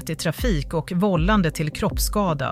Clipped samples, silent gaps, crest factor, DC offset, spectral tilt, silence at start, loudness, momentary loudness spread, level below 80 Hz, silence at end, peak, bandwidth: under 0.1%; none; 14 dB; under 0.1%; -5.5 dB/octave; 0 s; -22 LUFS; 6 LU; -30 dBFS; 0 s; -8 dBFS; 16 kHz